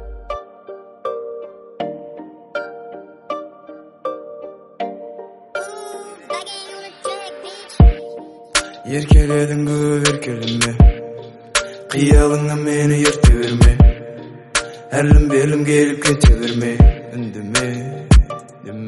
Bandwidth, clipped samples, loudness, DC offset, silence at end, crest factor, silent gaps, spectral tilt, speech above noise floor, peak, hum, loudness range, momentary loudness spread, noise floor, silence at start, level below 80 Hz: 11.5 kHz; under 0.1%; -16 LUFS; under 0.1%; 0 s; 16 dB; none; -5.5 dB/octave; 27 dB; 0 dBFS; none; 16 LU; 21 LU; -40 dBFS; 0 s; -20 dBFS